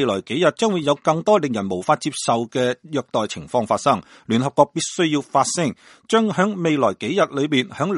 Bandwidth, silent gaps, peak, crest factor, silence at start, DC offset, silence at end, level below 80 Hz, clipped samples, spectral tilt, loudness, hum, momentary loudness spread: 11.5 kHz; none; 0 dBFS; 20 dB; 0 s; under 0.1%; 0 s; -62 dBFS; under 0.1%; -4.5 dB/octave; -20 LUFS; none; 5 LU